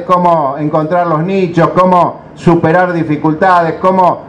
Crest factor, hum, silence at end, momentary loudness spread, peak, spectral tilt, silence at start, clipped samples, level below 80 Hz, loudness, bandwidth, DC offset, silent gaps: 10 dB; none; 0 s; 5 LU; 0 dBFS; -8 dB/octave; 0 s; 0.3%; -44 dBFS; -11 LUFS; 9.6 kHz; under 0.1%; none